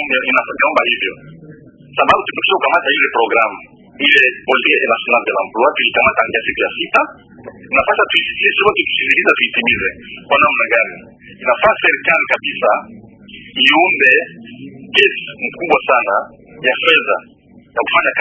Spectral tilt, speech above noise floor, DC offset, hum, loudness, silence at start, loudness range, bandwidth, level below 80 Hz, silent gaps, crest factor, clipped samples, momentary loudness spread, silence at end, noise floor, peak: -4 dB/octave; 24 dB; under 0.1%; none; -13 LUFS; 0 s; 2 LU; 8 kHz; -50 dBFS; none; 16 dB; under 0.1%; 11 LU; 0 s; -39 dBFS; 0 dBFS